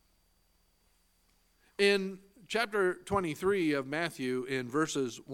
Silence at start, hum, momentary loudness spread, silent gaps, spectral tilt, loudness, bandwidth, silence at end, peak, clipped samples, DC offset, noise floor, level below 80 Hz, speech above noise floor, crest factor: 1.8 s; 60 Hz at -65 dBFS; 8 LU; none; -4.5 dB/octave; -32 LUFS; 16.5 kHz; 0 s; -12 dBFS; under 0.1%; under 0.1%; -71 dBFS; -64 dBFS; 39 dB; 20 dB